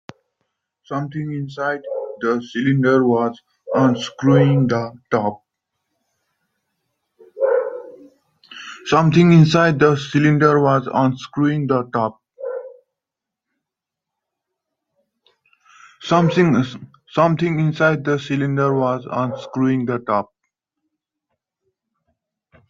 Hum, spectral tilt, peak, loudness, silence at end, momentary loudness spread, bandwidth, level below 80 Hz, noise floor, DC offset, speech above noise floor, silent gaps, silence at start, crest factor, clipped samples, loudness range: none; -7.5 dB/octave; 0 dBFS; -18 LUFS; 2.45 s; 15 LU; 7.6 kHz; -58 dBFS; -85 dBFS; under 0.1%; 68 dB; none; 0.9 s; 18 dB; under 0.1%; 11 LU